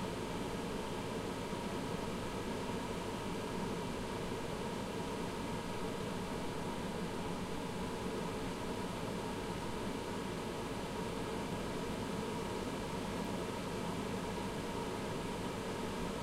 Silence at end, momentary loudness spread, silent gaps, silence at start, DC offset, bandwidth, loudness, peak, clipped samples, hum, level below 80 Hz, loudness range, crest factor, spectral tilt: 0 s; 1 LU; none; 0 s; under 0.1%; 16.5 kHz; -41 LUFS; -26 dBFS; under 0.1%; none; -54 dBFS; 1 LU; 14 dB; -5 dB/octave